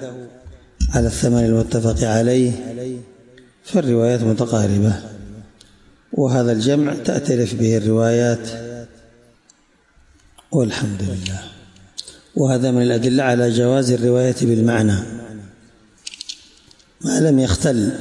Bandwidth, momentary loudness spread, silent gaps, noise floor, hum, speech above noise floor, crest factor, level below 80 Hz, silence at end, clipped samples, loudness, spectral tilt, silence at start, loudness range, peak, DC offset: 11.5 kHz; 18 LU; none; -55 dBFS; none; 38 dB; 14 dB; -36 dBFS; 0 s; under 0.1%; -18 LUFS; -6 dB/octave; 0 s; 7 LU; -6 dBFS; under 0.1%